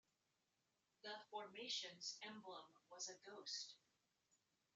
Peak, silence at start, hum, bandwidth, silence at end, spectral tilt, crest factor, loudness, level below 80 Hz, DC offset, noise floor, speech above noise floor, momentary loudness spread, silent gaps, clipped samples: -34 dBFS; 1.05 s; none; 8 kHz; 1 s; 0.5 dB/octave; 22 dB; -52 LUFS; under -90 dBFS; under 0.1%; -88 dBFS; 34 dB; 12 LU; none; under 0.1%